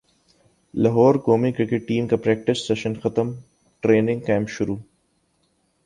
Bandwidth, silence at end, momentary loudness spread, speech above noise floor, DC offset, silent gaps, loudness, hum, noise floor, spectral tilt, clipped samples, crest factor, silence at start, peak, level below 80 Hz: 10.5 kHz; 1.05 s; 11 LU; 46 dB; under 0.1%; none; -21 LUFS; none; -67 dBFS; -7 dB/octave; under 0.1%; 18 dB; 0.75 s; -4 dBFS; -54 dBFS